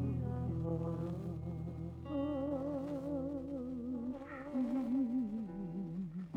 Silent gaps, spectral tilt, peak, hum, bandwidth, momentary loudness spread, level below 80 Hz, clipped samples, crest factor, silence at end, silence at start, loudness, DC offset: none; -10 dB/octave; -26 dBFS; none; 7.6 kHz; 8 LU; -60 dBFS; under 0.1%; 12 dB; 0 s; 0 s; -40 LUFS; under 0.1%